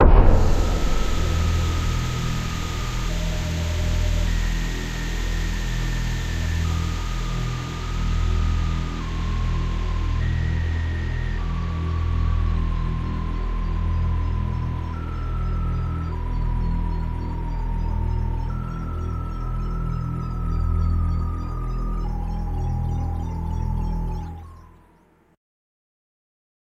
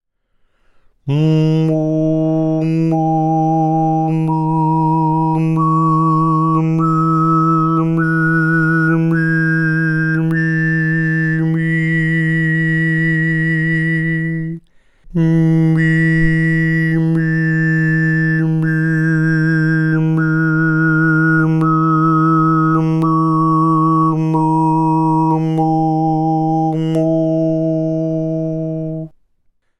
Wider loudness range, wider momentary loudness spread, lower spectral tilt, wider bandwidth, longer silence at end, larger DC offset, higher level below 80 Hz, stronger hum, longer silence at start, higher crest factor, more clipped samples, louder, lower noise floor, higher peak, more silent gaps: about the same, 3 LU vs 2 LU; about the same, 6 LU vs 4 LU; second, -6 dB/octave vs -9 dB/octave; first, 13 kHz vs 6 kHz; first, 2.05 s vs 0.7 s; neither; first, -24 dBFS vs -42 dBFS; neither; second, 0 s vs 1.05 s; first, 22 dB vs 14 dB; neither; second, -26 LUFS vs -15 LUFS; about the same, -57 dBFS vs -60 dBFS; about the same, 0 dBFS vs -2 dBFS; neither